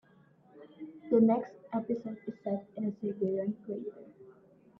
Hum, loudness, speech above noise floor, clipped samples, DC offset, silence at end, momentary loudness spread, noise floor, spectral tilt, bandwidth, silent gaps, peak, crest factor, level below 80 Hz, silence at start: none; -33 LUFS; 31 dB; under 0.1%; under 0.1%; 0.5 s; 22 LU; -63 dBFS; -11 dB/octave; 3.8 kHz; none; -14 dBFS; 20 dB; -78 dBFS; 0.55 s